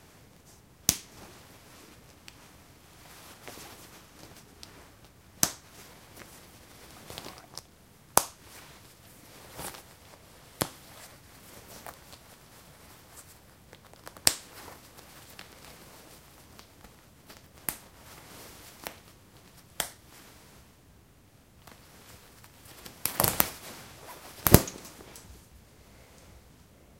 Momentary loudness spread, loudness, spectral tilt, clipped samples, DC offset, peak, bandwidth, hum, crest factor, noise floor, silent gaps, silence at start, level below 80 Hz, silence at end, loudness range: 27 LU; -29 LUFS; -3 dB/octave; under 0.1%; under 0.1%; 0 dBFS; 17 kHz; none; 36 dB; -58 dBFS; none; 0.9 s; -52 dBFS; 0.6 s; 21 LU